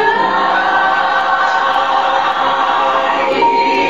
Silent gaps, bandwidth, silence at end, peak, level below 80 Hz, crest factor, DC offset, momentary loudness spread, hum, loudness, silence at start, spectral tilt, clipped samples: none; 7.8 kHz; 0 s; -2 dBFS; -52 dBFS; 12 dB; 0.9%; 2 LU; none; -13 LUFS; 0 s; -3 dB/octave; under 0.1%